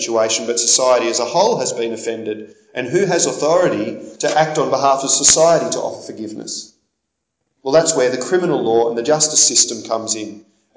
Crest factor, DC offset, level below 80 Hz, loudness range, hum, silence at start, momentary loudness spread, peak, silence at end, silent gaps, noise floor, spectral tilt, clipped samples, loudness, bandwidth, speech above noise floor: 16 dB; under 0.1%; -60 dBFS; 4 LU; none; 0 s; 16 LU; 0 dBFS; 0.35 s; none; -75 dBFS; -2 dB/octave; under 0.1%; -15 LUFS; 8 kHz; 59 dB